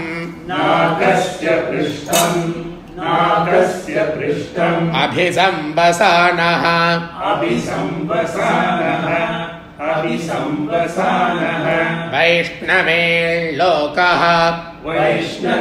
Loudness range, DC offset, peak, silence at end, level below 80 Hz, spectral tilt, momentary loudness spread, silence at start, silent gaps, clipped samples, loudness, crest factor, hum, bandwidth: 4 LU; under 0.1%; 0 dBFS; 0 s; -48 dBFS; -4.5 dB/octave; 8 LU; 0 s; none; under 0.1%; -16 LUFS; 16 dB; none; 16 kHz